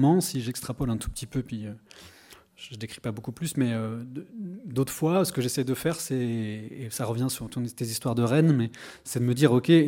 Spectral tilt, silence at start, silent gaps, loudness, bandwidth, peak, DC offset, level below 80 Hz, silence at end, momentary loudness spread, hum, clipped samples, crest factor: -6 dB/octave; 0 s; none; -28 LUFS; 17 kHz; -4 dBFS; under 0.1%; -52 dBFS; 0 s; 16 LU; none; under 0.1%; 22 dB